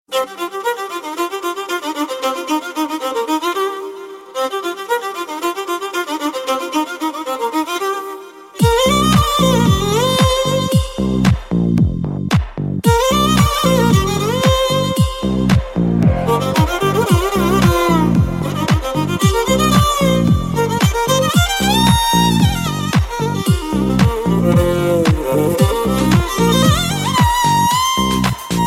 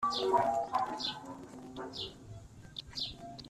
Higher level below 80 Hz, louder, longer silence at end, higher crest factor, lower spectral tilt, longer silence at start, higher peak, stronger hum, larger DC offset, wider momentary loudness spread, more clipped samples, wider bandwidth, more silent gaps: first, -28 dBFS vs -62 dBFS; first, -15 LUFS vs -35 LUFS; about the same, 0 s vs 0 s; second, 14 dB vs 20 dB; about the same, -5 dB/octave vs -4 dB/octave; about the same, 0.1 s vs 0 s; first, 0 dBFS vs -16 dBFS; neither; neither; second, 9 LU vs 18 LU; neither; first, 16.5 kHz vs 13.5 kHz; neither